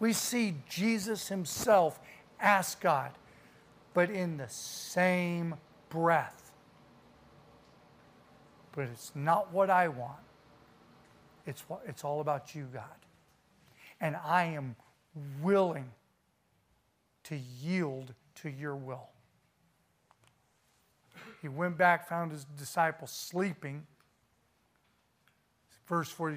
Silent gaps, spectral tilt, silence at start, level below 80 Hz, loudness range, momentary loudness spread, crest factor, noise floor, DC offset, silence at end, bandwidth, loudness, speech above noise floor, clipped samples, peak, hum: none; -5 dB/octave; 0 s; -74 dBFS; 11 LU; 19 LU; 24 dB; -74 dBFS; under 0.1%; 0 s; 15.5 kHz; -32 LUFS; 42 dB; under 0.1%; -12 dBFS; none